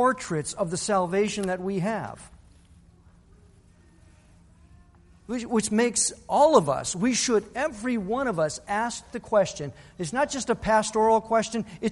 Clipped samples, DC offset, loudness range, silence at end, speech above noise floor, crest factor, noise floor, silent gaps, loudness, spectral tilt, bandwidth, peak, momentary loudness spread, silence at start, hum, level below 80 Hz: under 0.1%; under 0.1%; 11 LU; 0 s; 30 dB; 22 dB; -56 dBFS; none; -25 LUFS; -4 dB/octave; 11.5 kHz; -4 dBFS; 10 LU; 0 s; none; -54 dBFS